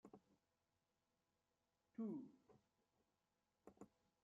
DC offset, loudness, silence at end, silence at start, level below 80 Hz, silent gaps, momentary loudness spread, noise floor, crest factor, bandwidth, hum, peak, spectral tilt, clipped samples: under 0.1%; -54 LUFS; 0.35 s; 0.05 s; under -90 dBFS; none; 17 LU; under -90 dBFS; 20 dB; 7 kHz; none; -42 dBFS; -9.5 dB/octave; under 0.1%